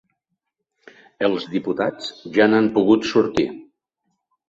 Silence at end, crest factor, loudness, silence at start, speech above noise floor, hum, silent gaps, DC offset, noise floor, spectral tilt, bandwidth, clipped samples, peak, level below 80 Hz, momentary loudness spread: 0.85 s; 18 dB; -20 LUFS; 1.2 s; 59 dB; none; none; under 0.1%; -78 dBFS; -6 dB/octave; 7.8 kHz; under 0.1%; -2 dBFS; -58 dBFS; 10 LU